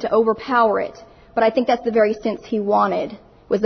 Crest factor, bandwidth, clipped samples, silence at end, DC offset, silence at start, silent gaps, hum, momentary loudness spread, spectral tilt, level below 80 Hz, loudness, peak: 14 dB; 6.4 kHz; under 0.1%; 0 s; under 0.1%; 0 s; none; none; 8 LU; -6.5 dB/octave; -54 dBFS; -19 LUFS; -4 dBFS